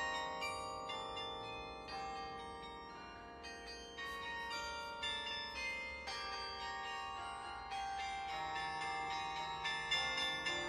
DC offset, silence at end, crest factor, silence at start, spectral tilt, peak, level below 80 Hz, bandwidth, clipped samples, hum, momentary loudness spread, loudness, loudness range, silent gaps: under 0.1%; 0 s; 20 dB; 0 s; -2 dB/octave; -24 dBFS; -64 dBFS; 15 kHz; under 0.1%; none; 12 LU; -43 LUFS; 6 LU; none